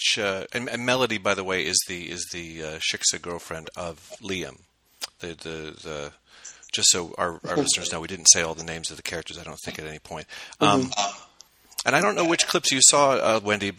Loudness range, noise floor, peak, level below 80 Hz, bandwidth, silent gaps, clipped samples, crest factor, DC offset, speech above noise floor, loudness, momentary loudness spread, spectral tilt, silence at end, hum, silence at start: 9 LU; -54 dBFS; 0 dBFS; -58 dBFS; 16 kHz; none; under 0.1%; 26 dB; under 0.1%; 29 dB; -22 LUFS; 20 LU; -1.5 dB/octave; 0.05 s; none; 0 s